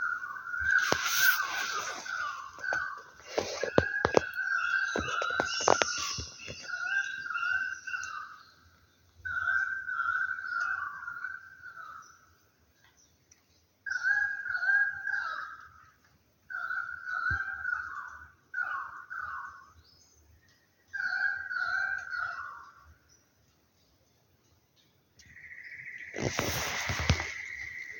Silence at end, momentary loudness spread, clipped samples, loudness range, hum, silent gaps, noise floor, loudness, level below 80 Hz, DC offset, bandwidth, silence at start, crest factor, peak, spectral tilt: 0 s; 17 LU; under 0.1%; 10 LU; none; none; -68 dBFS; -31 LUFS; -54 dBFS; under 0.1%; 17 kHz; 0 s; 30 dB; -4 dBFS; -2.5 dB/octave